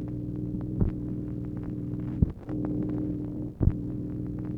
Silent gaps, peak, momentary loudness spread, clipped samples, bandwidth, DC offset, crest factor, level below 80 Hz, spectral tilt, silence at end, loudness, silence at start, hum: none; -8 dBFS; 6 LU; under 0.1%; 3.2 kHz; under 0.1%; 22 dB; -38 dBFS; -12 dB/octave; 0 s; -32 LUFS; 0 s; 60 Hz at -40 dBFS